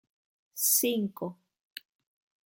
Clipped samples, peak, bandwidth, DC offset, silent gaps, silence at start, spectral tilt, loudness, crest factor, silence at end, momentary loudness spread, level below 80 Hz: under 0.1%; -12 dBFS; 17 kHz; under 0.1%; none; 0.55 s; -2.5 dB/octave; -27 LUFS; 22 dB; 1.15 s; 23 LU; -84 dBFS